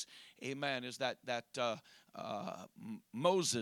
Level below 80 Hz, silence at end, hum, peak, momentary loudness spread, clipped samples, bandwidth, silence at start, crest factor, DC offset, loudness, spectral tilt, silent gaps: -88 dBFS; 0 s; none; -16 dBFS; 16 LU; under 0.1%; 18.5 kHz; 0 s; 24 dB; under 0.1%; -39 LUFS; -3.5 dB/octave; none